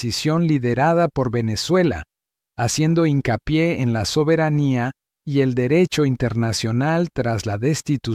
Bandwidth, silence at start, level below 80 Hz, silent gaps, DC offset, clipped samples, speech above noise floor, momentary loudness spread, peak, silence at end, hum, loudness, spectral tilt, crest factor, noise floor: 15 kHz; 0 s; -46 dBFS; none; under 0.1%; under 0.1%; 47 dB; 5 LU; -6 dBFS; 0 s; none; -20 LUFS; -6 dB/octave; 14 dB; -66 dBFS